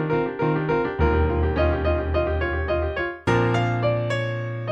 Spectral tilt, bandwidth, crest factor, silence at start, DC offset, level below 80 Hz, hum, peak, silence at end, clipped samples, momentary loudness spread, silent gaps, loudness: -8 dB/octave; 7.8 kHz; 14 dB; 0 s; under 0.1%; -30 dBFS; none; -8 dBFS; 0 s; under 0.1%; 5 LU; none; -23 LUFS